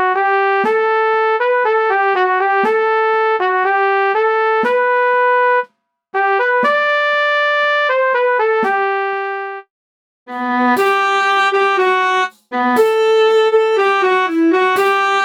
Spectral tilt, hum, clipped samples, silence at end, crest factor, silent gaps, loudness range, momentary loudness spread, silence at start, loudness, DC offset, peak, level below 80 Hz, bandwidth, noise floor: -3 dB/octave; none; under 0.1%; 0 s; 12 dB; 9.70-10.26 s; 3 LU; 6 LU; 0 s; -14 LUFS; under 0.1%; -2 dBFS; -74 dBFS; 18.5 kHz; -49 dBFS